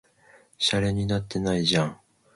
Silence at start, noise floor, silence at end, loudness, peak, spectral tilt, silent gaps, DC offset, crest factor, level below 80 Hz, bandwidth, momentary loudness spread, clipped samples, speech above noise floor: 0.6 s; -57 dBFS; 0.4 s; -25 LUFS; -8 dBFS; -5 dB/octave; none; under 0.1%; 20 dB; -48 dBFS; 11.5 kHz; 5 LU; under 0.1%; 32 dB